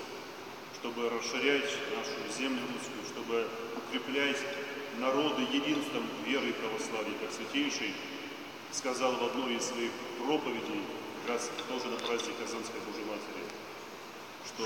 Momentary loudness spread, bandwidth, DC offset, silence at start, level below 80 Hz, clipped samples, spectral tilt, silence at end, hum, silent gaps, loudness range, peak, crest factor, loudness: 12 LU; 17 kHz; under 0.1%; 0 s; -80 dBFS; under 0.1%; -2.5 dB/octave; 0 s; none; none; 4 LU; -14 dBFS; 20 dB; -35 LUFS